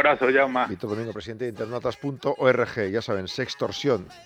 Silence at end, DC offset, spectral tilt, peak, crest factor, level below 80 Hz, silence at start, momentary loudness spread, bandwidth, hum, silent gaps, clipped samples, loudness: 0.05 s; under 0.1%; -5.5 dB/octave; -6 dBFS; 18 dB; -60 dBFS; 0 s; 11 LU; 10.5 kHz; none; none; under 0.1%; -25 LUFS